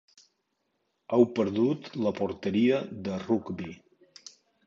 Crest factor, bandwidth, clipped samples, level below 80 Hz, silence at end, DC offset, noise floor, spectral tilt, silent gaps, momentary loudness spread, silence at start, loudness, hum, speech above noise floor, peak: 22 dB; 7.4 kHz; under 0.1%; -62 dBFS; 0.9 s; under 0.1%; -78 dBFS; -7 dB/octave; none; 17 LU; 1.1 s; -28 LUFS; none; 50 dB; -8 dBFS